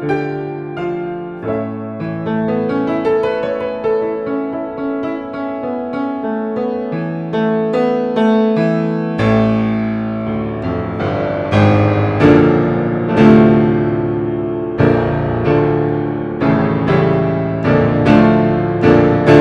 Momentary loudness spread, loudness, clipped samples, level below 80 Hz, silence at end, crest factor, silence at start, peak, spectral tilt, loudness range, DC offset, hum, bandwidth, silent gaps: 11 LU; -15 LUFS; under 0.1%; -40 dBFS; 0 s; 14 dB; 0 s; 0 dBFS; -9 dB/octave; 8 LU; under 0.1%; none; 7 kHz; none